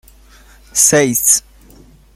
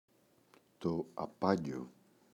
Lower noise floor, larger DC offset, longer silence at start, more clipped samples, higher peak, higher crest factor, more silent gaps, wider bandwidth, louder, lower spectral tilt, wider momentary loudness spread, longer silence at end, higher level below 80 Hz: second, -44 dBFS vs -68 dBFS; neither; about the same, 0.75 s vs 0.8 s; neither; first, 0 dBFS vs -16 dBFS; second, 16 dB vs 24 dB; neither; first, over 20 kHz vs 13.5 kHz; first, -11 LUFS vs -38 LUFS; second, -2.5 dB/octave vs -7.5 dB/octave; second, 5 LU vs 12 LU; first, 0.75 s vs 0.45 s; first, -46 dBFS vs -70 dBFS